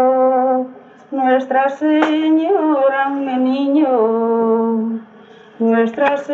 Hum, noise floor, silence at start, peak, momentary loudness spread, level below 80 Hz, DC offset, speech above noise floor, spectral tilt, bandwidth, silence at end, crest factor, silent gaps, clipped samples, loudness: none; -42 dBFS; 0 s; 0 dBFS; 7 LU; -74 dBFS; under 0.1%; 27 dB; -7 dB/octave; 7.2 kHz; 0 s; 16 dB; none; under 0.1%; -16 LUFS